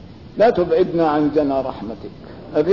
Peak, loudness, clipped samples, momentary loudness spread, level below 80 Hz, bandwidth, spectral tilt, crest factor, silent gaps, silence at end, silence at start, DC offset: -6 dBFS; -18 LUFS; under 0.1%; 18 LU; -48 dBFS; 6 kHz; -8.5 dB/octave; 12 dB; none; 0 s; 0 s; 0.3%